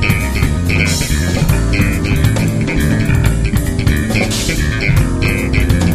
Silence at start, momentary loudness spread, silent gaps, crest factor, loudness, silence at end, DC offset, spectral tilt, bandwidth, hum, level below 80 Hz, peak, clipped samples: 0 s; 2 LU; none; 12 dB; -14 LUFS; 0 s; under 0.1%; -5.5 dB/octave; 15.5 kHz; none; -18 dBFS; 0 dBFS; under 0.1%